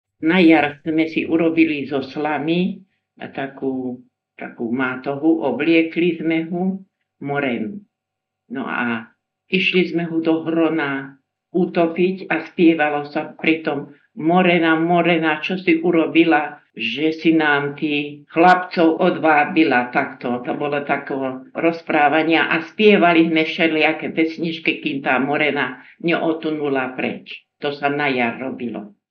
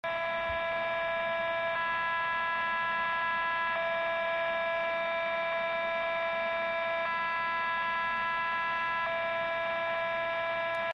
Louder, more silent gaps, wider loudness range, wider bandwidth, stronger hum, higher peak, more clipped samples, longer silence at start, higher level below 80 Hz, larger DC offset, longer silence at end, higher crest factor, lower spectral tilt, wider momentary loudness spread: first, -19 LUFS vs -31 LUFS; neither; first, 6 LU vs 1 LU; second, 5.8 kHz vs 6.6 kHz; neither; first, 0 dBFS vs -22 dBFS; neither; first, 0.2 s vs 0.05 s; second, -72 dBFS vs -62 dBFS; neither; first, 0.25 s vs 0 s; first, 18 dB vs 10 dB; first, -7.5 dB/octave vs -4 dB/octave; first, 12 LU vs 2 LU